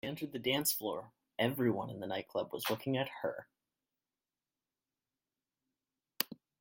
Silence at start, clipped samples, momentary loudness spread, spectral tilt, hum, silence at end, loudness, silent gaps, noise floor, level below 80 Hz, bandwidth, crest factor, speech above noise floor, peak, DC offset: 0.05 s; under 0.1%; 9 LU; -4 dB/octave; none; 0.25 s; -37 LUFS; none; under -90 dBFS; -78 dBFS; 16.5 kHz; 28 dB; over 53 dB; -10 dBFS; under 0.1%